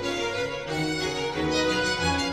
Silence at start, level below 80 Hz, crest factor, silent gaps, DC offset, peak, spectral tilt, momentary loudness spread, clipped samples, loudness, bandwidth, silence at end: 0 s; -46 dBFS; 14 dB; none; 0.2%; -12 dBFS; -4 dB/octave; 5 LU; under 0.1%; -26 LUFS; 14.5 kHz; 0 s